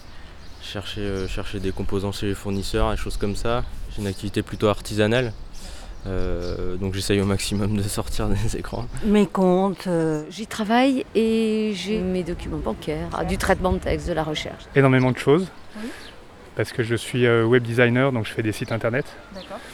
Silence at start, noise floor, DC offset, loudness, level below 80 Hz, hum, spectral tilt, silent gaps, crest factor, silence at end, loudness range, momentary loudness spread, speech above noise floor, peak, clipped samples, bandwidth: 0 s; -42 dBFS; under 0.1%; -23 LUFS; -34 dBFS; none; -6 dB/octave; none; 20 dB; 0 s; 5 LU; 15 LU; 20 dB; -4 dBFS; under 0.1%; 18.5 kHz